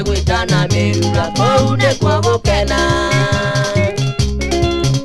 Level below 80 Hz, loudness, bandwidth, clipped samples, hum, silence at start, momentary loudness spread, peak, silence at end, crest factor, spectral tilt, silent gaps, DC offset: -24 dBFS; -14 LUFS; 12.5 kHz; under 0.1%; none; 0 s; 4 LU; 0 dBFS; 0 s; 14 dB; -5 dB/octave; none; under 0.1%